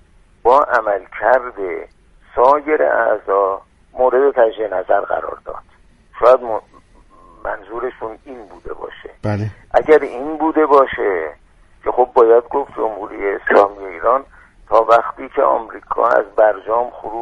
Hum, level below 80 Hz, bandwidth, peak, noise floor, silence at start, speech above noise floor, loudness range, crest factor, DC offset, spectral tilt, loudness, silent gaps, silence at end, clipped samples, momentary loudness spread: none; -46 dBFS; 7.6 kHz; 0 dBFS; -46 dBFS; 0.45 s; 30 dB; 5 LU; 16 dB; under 0.1%; -7.5 dB/octave; -16 LUFS; none; 0 s; under 0.1%; 17 LU